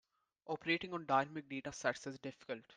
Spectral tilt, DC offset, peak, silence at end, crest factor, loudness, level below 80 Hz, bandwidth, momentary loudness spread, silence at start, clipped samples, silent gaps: -4.5 dB/octave; under 0.1%; -20 dBFS; 0.05 s; 22 dB; -40 LUFS; -78 dBFS; 10 kHz; 12 LU; 0.45 s; under 0.1%; none